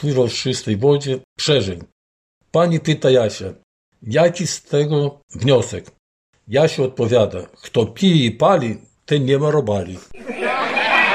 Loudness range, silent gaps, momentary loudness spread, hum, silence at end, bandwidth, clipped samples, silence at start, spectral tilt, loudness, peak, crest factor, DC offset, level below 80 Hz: 2 LU; 1.24-1.36 s, 1.92-2.41 s, 3.63-3.92 s, 5.23-5.28 s, 5.99-6.33 s; 13 LU; none; 0 s; 12 kHz; under 0.1%; 0 s; -5.5 dB/octave; -18 LUFS; -2 dBFS; 16 dB; under 0.1%; -56 dBFS